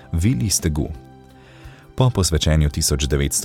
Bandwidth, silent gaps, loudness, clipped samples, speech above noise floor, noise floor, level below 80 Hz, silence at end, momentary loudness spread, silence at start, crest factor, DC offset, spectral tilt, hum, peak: 17.5 kHz; none; -19 LUFS; under 0.1%; 26 dB; -44 dBFS; -28 dBFS; 0 s; 11 LU; 0.1 s; 16 dB; under 0.1%; -4.5 dB/octave; none; -4 dBFS